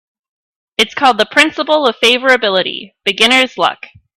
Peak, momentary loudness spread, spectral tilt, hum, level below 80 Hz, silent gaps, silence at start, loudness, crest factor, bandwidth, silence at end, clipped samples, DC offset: 0 dBFS; 9 LU; -2 dB/octave; none; -56 dBFS; none; 0.8 s; -12 LUFS; 14 dB; 16.5 kHz; 0.4 s; under 0.1%; under 0.1%